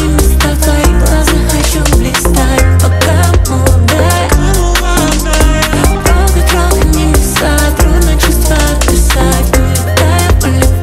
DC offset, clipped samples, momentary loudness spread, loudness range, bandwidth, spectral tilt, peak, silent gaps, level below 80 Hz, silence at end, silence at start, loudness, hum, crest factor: under 0.1%; 0.2%; 2 LU; 0 LU; 16.5 kHz; -4.5 dB/octave; 0 dBFS; none; -10 dBFS; 0 s; 0 s; -9 LUFS; none; 8 dB